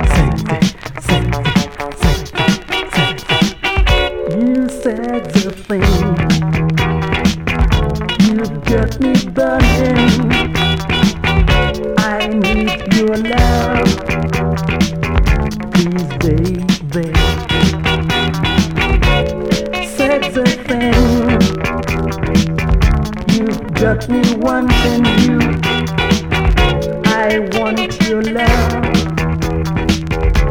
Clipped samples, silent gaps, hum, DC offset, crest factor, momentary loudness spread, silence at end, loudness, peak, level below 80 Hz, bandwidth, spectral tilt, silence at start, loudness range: under 0.1%; none; none; 0.8%; 14 dB; 5 LU; 0 s; -14 LUFS; 0 dBFS; -20 dBFS; 17 kHz; -5.5 dB/octave; 0 s; 2 LU